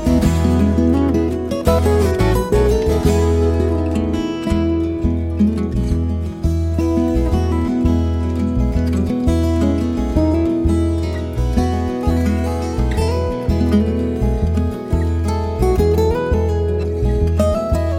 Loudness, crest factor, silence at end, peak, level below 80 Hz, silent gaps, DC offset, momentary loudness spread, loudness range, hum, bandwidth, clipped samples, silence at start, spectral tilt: -17 LUFS; 14 dB; 0 s; -2 dBFS; -22 dBFS; none; under 0.1%; 5 LU; 3 LU; none; 15 kHz; under 0.1%; 0 s; -8 dB/octave